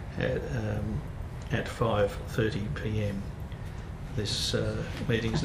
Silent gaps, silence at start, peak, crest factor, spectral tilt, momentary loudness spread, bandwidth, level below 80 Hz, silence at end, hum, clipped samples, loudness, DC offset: none; 0 s; -14 dBFS; 16 dB; -5.5 dB/octave; 11 LU; 15 kHz; -42 dBFS; 0 s; none; under 0.1%; -32 LUFS; under 0.1%